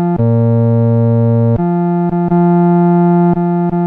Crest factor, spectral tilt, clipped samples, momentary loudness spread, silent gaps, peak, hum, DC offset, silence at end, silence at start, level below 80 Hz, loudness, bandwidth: 8 dB; -13 dB/octave; under 0.1%; 4 LU; none; -2 dBFS; none; under 0.1%; 0 s; 0 s; -42 dBFS; -12 LUFS; 2.7 kHz